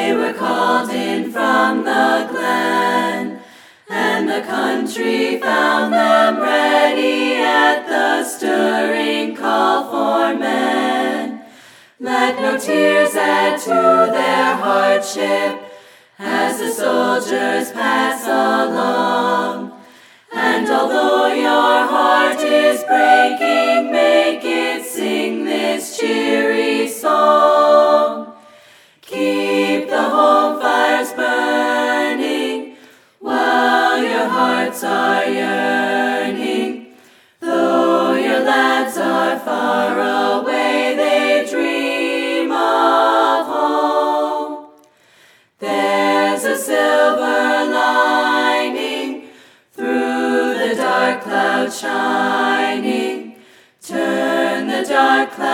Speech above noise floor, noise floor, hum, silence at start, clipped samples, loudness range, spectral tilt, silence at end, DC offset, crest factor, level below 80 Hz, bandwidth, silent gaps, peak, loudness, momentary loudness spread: 36 dB; -51 dBFS; none; 0 s; under 0.1%; 4 LU; -3 dB/octave; 0 s; under 0.1%; 16 dB; -68 dBFS; 18 kHz; none; 0 dBFS; -16 LUFS; 8 LU